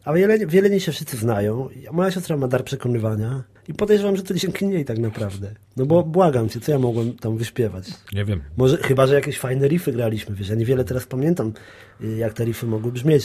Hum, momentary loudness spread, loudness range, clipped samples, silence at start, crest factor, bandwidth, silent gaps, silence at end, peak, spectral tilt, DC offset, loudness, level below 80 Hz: none; 11 LU; 3 LU; under 0.1%; 0.05 s; 18 dB; 15 kHz; none; 0 s; -4 dBFS; -7 dB/octave; under 0.1%; -21 LUFS; -46 dBFS